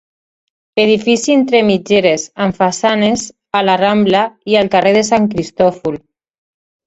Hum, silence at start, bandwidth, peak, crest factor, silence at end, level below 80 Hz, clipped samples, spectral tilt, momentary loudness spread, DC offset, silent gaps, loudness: none; 0.75 s; 8.2 kHz; 0 dBFS; 14 dB; 0.9 s; -50 dBFS; under 0.1%; -4.5 dB/octave; 7 LU; under 0.1%; none; -13 LUFS